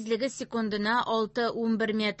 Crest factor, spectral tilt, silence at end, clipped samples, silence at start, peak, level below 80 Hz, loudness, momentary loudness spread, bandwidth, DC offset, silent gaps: 14 dB; -4.5 dB/octave; 0.05 s; under 0.1%; 0 s; -14 dBFS; -66 dBFS; -28 LUFS; 4 LU; 8.4 kHz; under 0.1%; none